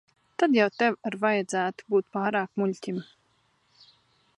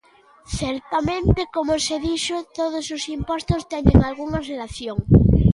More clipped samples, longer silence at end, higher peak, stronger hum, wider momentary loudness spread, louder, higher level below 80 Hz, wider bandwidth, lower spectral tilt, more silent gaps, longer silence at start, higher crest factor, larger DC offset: neither; first, 1.35 s vs 0 s; second, -8 dBFS vs 0 dBFS; neither; about the same, 12 LU vs 12 LU; second, -27 LUFS vs -21 LUFS; second, -78 dBFS vs -28 dBFS; about the same, 11.5 kHz vs 11.5 kHz; about the same, -5.5 dB/octave vs -6 dB/octave; neither; about the same, 0.4 s vs 0.5 s; about the same, 20 dB vs 20 dB; neither